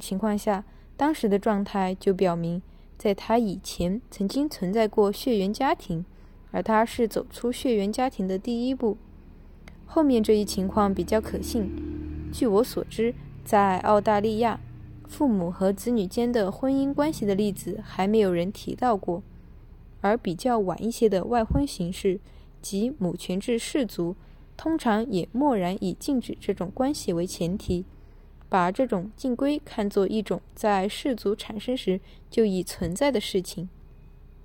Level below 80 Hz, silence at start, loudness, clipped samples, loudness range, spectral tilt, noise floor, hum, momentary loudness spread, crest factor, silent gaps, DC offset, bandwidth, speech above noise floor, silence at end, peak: -46 dBFS; 0 s; -26 LUFS; under 0.1%; 3 LU; -6 dB/octave; -48 dBFS; none; 9 LU; 18 dB; none; under 0.1%; 17.5 kHz; 23 dB; 0 s; -8 dBFS